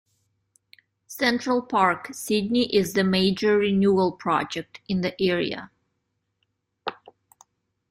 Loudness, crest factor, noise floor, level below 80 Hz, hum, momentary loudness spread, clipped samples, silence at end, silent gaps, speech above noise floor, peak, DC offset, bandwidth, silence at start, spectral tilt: -23 LUFS; 20 dB; -77 dBFS; -60 dBFS; none; 15 LU; under 0.1%; 1 s; none; 54 dB; -6 dBFS; under 0.1%; 16 kHz; 1.1 s; -5 dB/octave